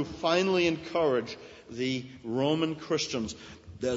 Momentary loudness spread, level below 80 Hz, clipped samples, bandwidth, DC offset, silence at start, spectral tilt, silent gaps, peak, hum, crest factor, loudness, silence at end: 17 LU; -60 dBFS; under 0.1%; 8 kHz; under 0.1%; 0 s; -5 dB/octave; none; -12 dBFS; none; 16 dB; -29 LUFS; 0 s